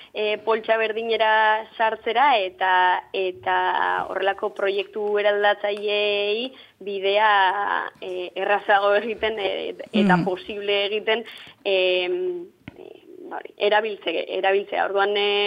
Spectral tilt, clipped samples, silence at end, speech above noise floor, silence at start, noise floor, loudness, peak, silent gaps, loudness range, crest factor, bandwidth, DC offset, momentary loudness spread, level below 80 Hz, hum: -6 dB/octave; under 0.1%; 0 s; 21 dB; 0 s; -43 dBFS; -22 LUFS; -6 dBFS; none; 4 LU; 18 dB; 9.6 kHz; under 0.1%; 10 LU; -66 dBFS; none